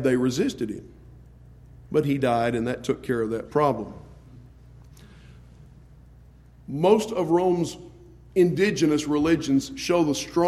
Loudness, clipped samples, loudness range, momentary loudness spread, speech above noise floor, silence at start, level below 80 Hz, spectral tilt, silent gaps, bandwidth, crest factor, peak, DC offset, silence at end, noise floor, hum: -24 LUFS; under 0.1%; 8 LU; 11 LU; 27 dB; 0 s; -52 dBFS; -6 dB/octave; none; 14.5 kHz; 18 dB; -6 dBFS; under 0.1%; 0 s; -50 dBFS; none